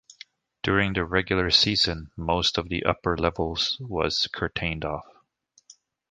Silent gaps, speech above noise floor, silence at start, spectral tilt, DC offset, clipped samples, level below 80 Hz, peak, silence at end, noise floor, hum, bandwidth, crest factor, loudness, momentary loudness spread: none; 39 dB; 0.65 s; -4 dB/octave; under 0.1%; under 0.1%; -44 dBFS; -2 dBFS; 0.4 s; -64 dBFS; none; 9.6 kHz; 24 dB; -24 LUFS; 10 LU